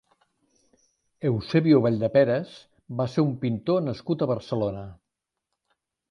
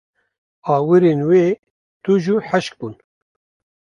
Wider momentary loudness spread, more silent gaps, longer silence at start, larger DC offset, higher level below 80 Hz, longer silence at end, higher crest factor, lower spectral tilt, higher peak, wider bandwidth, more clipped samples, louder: second, 12 LU vs 16 LU; second, none vs 1.59-1.63 s, 1.70-2.00 s; first, 1.2 s vs 0.65 s; neither; first, -58 dBFS vs -64 dBFS; first, 1.15 s vs 0.9 s; about the same, 18 dB vs 16 dB; about the same, -8.5 dB/octave vs -7.5 dB/octave; second, -8 dBFS vs -2 dBFS; about the same, 9.4 kHz vs 10 kHz; neither; second, -24 LUFS vs -17 LUFS